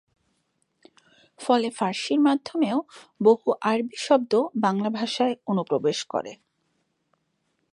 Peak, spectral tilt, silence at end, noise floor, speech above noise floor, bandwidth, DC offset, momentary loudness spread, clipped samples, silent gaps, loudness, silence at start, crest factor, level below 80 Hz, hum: -6 dBFS; -5 dB/octave; 1.4 s; -73 dBFS; 50 dB; 11 kHz; under 0.1%; 8 LU; under 0.1%; none; -24 LUFS; 1.4 s; 20 dB; -78 dBFS; none